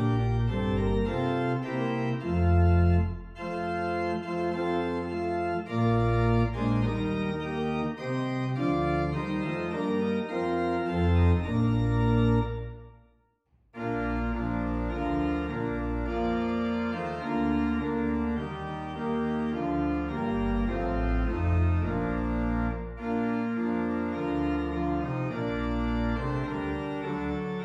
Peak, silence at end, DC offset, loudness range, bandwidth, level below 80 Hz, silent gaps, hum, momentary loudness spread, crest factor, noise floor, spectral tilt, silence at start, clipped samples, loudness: -12 dBFS; 0 s; under 0.1%; 3 LU; 7.8 kHz; -38 dBFS; none; none; 7 LU; 16 dB; -67 dBFS; -9 dB/octave; 0 s; under 0.1%; -29 LUFS